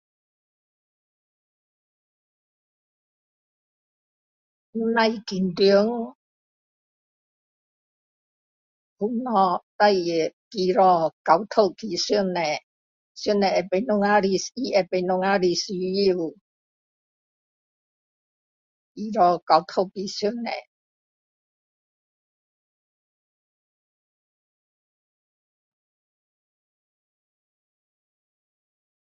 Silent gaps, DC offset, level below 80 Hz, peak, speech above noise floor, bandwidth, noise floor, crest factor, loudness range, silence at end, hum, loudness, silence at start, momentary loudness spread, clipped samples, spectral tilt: 6.15-8.96 s, 9.63-9.79 s, 10.33-10.51 s, 11.13-11.25 s, 12.63-13.15 s, 16.41-18.95 s, 19.42-19.47 s; under 0.1%; -68 dBFS; -2 dBFS; over 68 dB; 7.6 kHz; under -90 dBFS; 24 dB; 10 LU; 8.45 s; none; -23 LUFS; 4.75 s; 11 LU; under 0.1%; -5 dB/octave